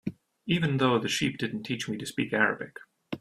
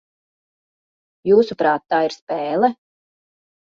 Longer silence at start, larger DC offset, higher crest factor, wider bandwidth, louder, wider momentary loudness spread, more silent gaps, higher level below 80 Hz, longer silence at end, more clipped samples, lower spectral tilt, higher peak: second, 0.05 s vs 1.25 s; neither; about the same, 22 dB vs 18 dB; first, 15 kHz vs 7.4 kHz; second, -28 LUFS vs -19 LUFS; first, 15 LU vs 8 LU; second, none vs 2.22-2.27 s; about the same, -64 dBFS vs -64 dBFS; second, 0.05 s vs 0.9 s; neither; about the same, -5 dB/octave vs -6 dB/octave; second, -8 dBFS vs -4 dBFS